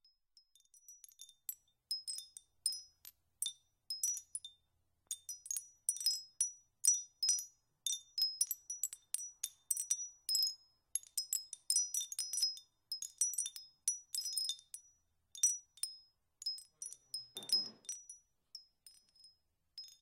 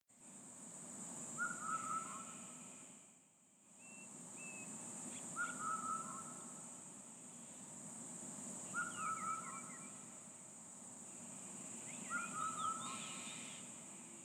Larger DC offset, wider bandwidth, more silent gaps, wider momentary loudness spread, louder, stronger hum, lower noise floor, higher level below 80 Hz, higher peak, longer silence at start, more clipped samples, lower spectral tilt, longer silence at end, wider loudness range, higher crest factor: neither; second, 16.5 kHz vs over 20 kHz; neither; first, 21 LU vs 12 LU; first, -38 LUFS vs -47 LUFS; neither; first, -81 dBFS vs -69 dBFS; about the same, -88 dBFS vs under -90 dBFS; first, -16 dBFS vs -30 dBFS; first, 0.9 s vs 0.1 s; neither; second, 4 dB/octave vs -2 dB/octave; about the same, 0.05 s vs 0 s; first, 7 LU vs 3 LU; first, 26 dB vs 18 dB